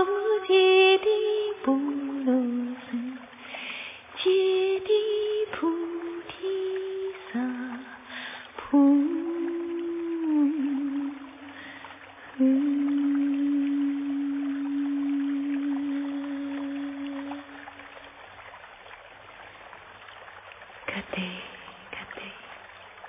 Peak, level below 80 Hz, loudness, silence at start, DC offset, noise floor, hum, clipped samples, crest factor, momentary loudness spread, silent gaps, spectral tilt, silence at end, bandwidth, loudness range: -10 dBFS; -68 dBFS; -27 LUFS; 0 s; under 0.1%; -47 dBFS; none; under 0.1%; 18 dB; 22 LU; none; -2.5 dB/octave; 0 s; 3.8 kHz; 12 LU